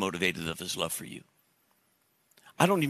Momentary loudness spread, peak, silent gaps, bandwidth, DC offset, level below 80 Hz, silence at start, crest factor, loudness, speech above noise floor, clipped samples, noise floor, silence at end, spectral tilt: 15 LU; -6 dBFS; none; 14 kHz; under 0.1%; -68 dBFS; 0 s; 26 dB; -31 LUFS; 41 dB; under 0.1%; -71 dBFS; 0 s; -4 dB/octave